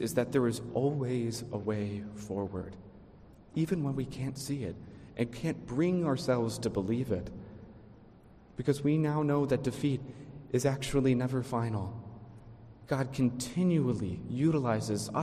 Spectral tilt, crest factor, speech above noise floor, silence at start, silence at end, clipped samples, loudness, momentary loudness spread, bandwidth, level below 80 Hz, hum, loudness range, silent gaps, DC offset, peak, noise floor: -6.5 dB/octave; 18 dB; 25 dB; 0 s; 0 s; under 0.1%; -32 LUFS; 17 LU; 15 kHz; -56 dBFS; none; 5 LU; none; under 0.1%; -14 dBFS; -56 dBFS